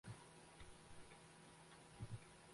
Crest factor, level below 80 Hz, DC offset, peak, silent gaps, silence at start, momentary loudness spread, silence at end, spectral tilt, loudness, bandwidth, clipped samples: 20 dB; -72 dBFS; under 0.1%; -40 dBFS; none; 0.05 s; 7 LU; 0 s; -4.5 dB/octave; -60 LUFS; 11.5 kHz; under 0.1%